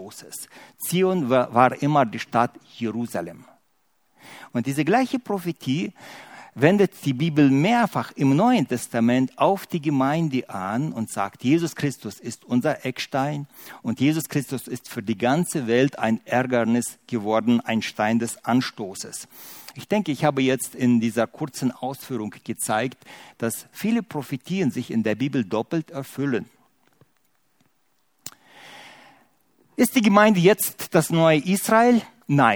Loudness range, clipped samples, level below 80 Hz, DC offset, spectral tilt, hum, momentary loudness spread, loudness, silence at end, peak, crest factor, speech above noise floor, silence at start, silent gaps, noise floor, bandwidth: 7 LU; under 0.1%; -68 dBFS; under 0.1%; -5.5 dB/octave; none; 15 LU; -23 LUFS; 0 s; -2 dBFS; 22 dB; 47 dB; 0 s; none; -70 dBFS; over 20 kHz